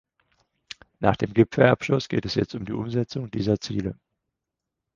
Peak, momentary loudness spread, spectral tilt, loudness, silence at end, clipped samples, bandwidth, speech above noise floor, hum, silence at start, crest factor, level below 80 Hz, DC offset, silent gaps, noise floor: -2 dBFS; 14 LU; -7 dB/octave; -24 LUFS; 1 s; under 0.1%; 7.4 kHz; 61 dB; none; 1 s; 24 dB; -50 dBFS; under 0.1%; none; -85 dBFS